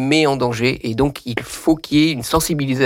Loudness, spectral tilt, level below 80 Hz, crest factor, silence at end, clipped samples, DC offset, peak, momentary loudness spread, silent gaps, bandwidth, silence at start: -18 LUFS; -5 dB/octave; -40 dBFS; 12 dB; 0 s; under 0.1%; under 0.1%; -4 dBFS; 5 LU; none; 17 kHz; 0 s